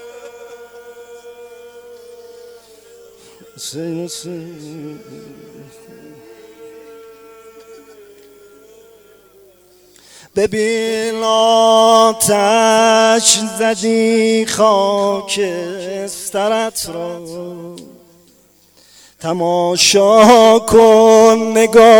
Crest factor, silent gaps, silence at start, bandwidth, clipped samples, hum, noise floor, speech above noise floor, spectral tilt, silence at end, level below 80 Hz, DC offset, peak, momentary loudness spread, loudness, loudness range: 14 dB; none; 0 s; 19.5 kHz; under 0.1%; 50 Hz at -50 dBFS; -51 dBFS; 38 dB; -3 dB/octave; 0 s; -52 dBFS; under 0.1%; 0 dBFS; 22 LU; -12 LUFS; 19 LU